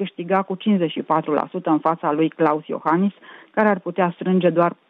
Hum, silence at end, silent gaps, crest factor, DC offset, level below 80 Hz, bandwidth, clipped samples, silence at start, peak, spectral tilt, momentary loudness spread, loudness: none; 0.15 s; none; 16 dB; under 0.1%; -74 dBFS; 4.3 kHz; under 0.1%; 0 s; -4 dBFS; -10 dB/octave; 4 LU; -21 LUFS